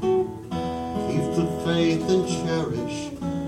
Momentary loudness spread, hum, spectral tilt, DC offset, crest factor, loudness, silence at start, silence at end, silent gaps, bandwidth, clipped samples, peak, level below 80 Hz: 8 LU; none; -6 dB/octave; under 0.1%; 14 dB; -25 LUFS; 0 s; 0 s; none; 14 kHz; under 0.1%; -10 dBFS; -48 dBFS